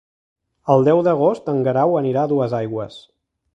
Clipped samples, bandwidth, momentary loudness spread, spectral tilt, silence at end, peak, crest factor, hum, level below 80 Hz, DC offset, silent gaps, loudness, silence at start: under 0.1%; 8.4 kHz; 13 LU; -9 dB/octave; 0.55 s; -2 dBFS; 18 dB; none; -62 dBFS; under 0.1%; none; -18 LUFS; 0.65 s